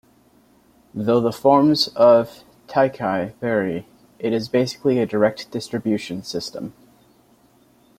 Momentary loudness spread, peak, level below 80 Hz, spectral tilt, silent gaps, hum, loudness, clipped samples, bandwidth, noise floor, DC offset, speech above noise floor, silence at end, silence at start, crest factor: 15 LU; -2 dBFS; -60 dBFS; -6 dB/octave; none; none; -20 LUFS; under 0.1%; 15.5 kHz; -56 dBFS; under 0.1%; 37 dB; 1.3 s; 0.95 s; 18 dB